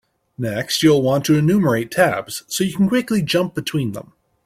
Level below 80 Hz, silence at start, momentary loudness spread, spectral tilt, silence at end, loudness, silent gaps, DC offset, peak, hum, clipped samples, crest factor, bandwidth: -54 dBFS; 0.4 s; 10 LU; -5.5 dB/octave; 0.45 s; -18 LUFS; none; under 0.1%; -2 dBFS; none; under 0.1%; 16 dB; 16 kHz